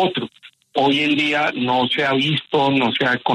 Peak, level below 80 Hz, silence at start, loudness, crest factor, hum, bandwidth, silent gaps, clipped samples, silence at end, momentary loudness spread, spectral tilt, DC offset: -6 dBFS; -62 dBFS; 0 s; -18 LUFS; 14 dB; none; 11 kHz; none; under 0.1%; 0 s; 6 LU; -5.5 dB/octave; under 0.1%